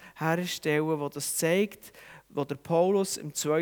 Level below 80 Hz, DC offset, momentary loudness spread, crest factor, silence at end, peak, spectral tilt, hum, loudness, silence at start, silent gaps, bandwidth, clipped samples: -70 dBFS; under 0.1%; 10 LU; 18 dB; 0 s; -12 dBFS; -4.5 dB/octave; none; -29 LUFS; 0 s; none; over 20 kHz; under 0.1%